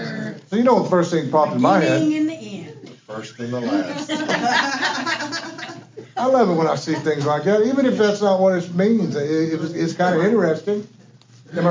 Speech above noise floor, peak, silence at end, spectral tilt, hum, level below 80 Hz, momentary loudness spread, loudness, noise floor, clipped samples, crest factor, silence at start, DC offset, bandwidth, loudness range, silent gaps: 29 dB; -2 dBFS; 0 s; -6 dB/octave; none; -70 dBFS; 15 LU; -19 LUFS; -48 dBFS; under 0.1%; 16 dB; 0 s; under 0.1%; 7.6 kHz; 4 LU; none